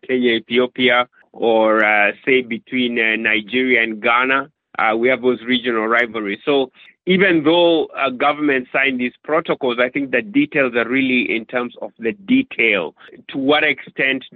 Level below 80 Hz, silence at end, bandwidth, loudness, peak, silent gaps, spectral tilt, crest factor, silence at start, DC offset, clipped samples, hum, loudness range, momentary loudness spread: -64 dBFS; 0 s; 4.6 kHz; -17 LUFS; 0 dBFS; none; -7.5 dB/octave; 16 dB; 0.05 s; under 0.1%; under 0.1%; none; 2 LU; 9 LU